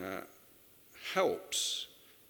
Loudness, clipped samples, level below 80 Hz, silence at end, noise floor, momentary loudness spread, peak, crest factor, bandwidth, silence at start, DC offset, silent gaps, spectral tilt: -35 LUFS; under 0.1%; -78 dBFS; 0.2 s; -61 dBFS; 14 LU; -16 dBFS; 24 dB; over 20 kHz; 0 s; under 0.1%; none; -1.5 dB/octave